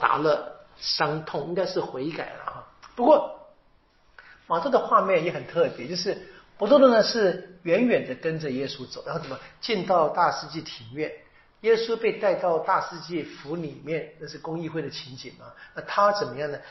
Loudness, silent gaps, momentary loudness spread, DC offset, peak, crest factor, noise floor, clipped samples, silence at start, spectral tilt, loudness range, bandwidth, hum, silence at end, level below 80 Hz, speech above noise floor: -25 LUFS; none; 16 LU; under 0.1%; -6 dBFS; 20 dB; -60 dBFS; under 0.1%; 0 s; -3.5 dB/octave; 7 LU; 6.2 kHz; none; 0 s; -62 dBFS; 35 dB